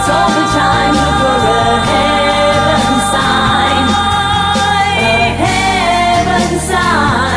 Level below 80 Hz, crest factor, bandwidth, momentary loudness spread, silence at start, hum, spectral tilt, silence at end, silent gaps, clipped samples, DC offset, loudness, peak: -28 dBFS; 10 dB; 11 kHz; 1 LU; 0 s; none; -4 dB/octave; 0 s; none; under 0.1%; under 0.1%; -11 LUFS; 0 dBFS